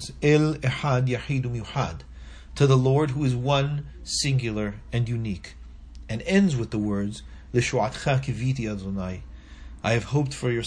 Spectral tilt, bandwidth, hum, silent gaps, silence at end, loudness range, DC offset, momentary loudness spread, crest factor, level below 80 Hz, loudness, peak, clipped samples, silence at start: -6 dB/octave; 10.5 kHz; none; none; 0 s; 3 LU; under 0.1%; 19 LU; 18 dB; -44 dBFS; -25 LUFS; -6 dBFS; under 0.1%; 0 s